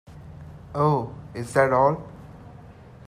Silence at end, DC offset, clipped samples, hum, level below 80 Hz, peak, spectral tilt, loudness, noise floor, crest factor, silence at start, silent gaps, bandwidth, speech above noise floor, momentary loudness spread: 0.35 s; under 0.1%; under 0.1%; none; -52 dBFS; -6 dBFS; -7 dB/octave; -23 LUFS; -45 dBFS; 18 dB; 0.1 s; none; 13.5 kHz; 24 dB; 25 LU